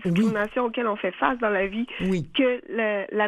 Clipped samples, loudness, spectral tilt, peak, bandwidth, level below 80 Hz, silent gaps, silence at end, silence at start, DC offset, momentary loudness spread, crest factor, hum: under 0.1%; -25 LUFS; -7 dB/octave; -4 dBFS; 12 kHz; -52 dBFS; none; 0 s; 0 s; under 0.1%; 4 LU; 20 dB; none